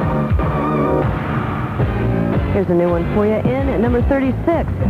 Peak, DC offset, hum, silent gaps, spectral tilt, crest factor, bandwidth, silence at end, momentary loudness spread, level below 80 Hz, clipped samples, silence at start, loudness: -4 dBFS; under 0.1%; none; none; -9.5 dB/octave; 12 dB; 13 kHz; 0 s; 4 LU; -26 dBFS; under 0.1%; 0 s; -17 LUFS